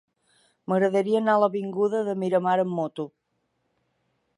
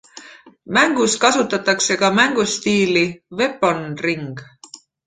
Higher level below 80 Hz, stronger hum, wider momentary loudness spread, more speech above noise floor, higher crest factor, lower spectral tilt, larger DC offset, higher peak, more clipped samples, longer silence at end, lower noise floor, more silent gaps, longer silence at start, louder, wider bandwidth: second, -78 dBFS vs -60 dBFS; neither; first, 11 LU vs 8 LU; first, 51 dB vs 26 dB; about the same, 18 dB vs 18 dB; first, -7.5 dB/octave vs -3 dB/octave; neither; second, -8 dBFS vs 0 dBFS; neither; first, 1.3 s vs 0.3 s; first, -75 dBFS vs -44 dBFS; neither; first, 0.7 s vs 0.15 s; second, -24 LUFS vs -17 LUFS; first, 11 kHz vs 9.6 kHz